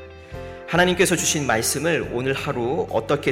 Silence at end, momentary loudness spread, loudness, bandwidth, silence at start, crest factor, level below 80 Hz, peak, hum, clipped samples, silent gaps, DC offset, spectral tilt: 0 s; 18 LU; -21 LUFS; 16.5 kHz; 0 s; 18 dB; -46 dBFS; -6 dBFS; none; under 0.1%; none; under 0.1%; -3.5 dB/octave